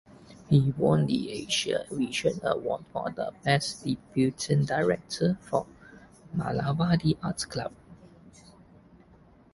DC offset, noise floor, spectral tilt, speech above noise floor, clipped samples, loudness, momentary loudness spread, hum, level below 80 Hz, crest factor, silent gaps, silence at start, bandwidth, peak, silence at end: under 0.1%; -57 dBFS; -5.5 dB/octave; 29 dB; under 0.1%; -28 LUFS; 9 LU; none; -56 dBFS; 20 dB; none; 0.3 s; 11.5 kHz; -8 dBFS; 1.25 s